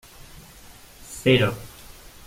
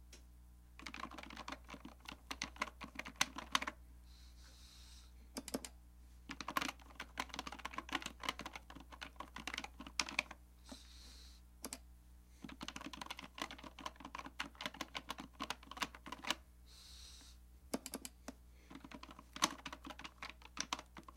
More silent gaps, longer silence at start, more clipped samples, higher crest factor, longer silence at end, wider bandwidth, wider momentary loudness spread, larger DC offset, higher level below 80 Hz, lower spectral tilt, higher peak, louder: neither; first, 1.1 s vs 0 s; neither; second, 22 dB vs 36 dB; first, 0.6 s vs 0 s; about the same, 16.5 kHz vs 16.5 kHz; first, 26 LU vs 20 LU; neither; first, -48 dBFS vs -62 dBFS; first, -5.5 dB/octave vs -1.5 dB/octave; first, -4 dBFS vs -12 dBFS; first, -21 LUFS vs -46 LUFS